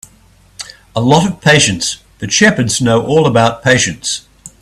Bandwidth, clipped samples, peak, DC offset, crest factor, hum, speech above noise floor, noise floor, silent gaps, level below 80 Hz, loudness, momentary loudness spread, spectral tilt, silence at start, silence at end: 14 kHz; under 0.1%; 0 dBFS; under 0.1%; 14 dB; none; 35 dB; -46 dBFS; none; -42 dBFS; -12 LUFS; 13 LU; -4 dB/octave; 0.6 s; 0.15 s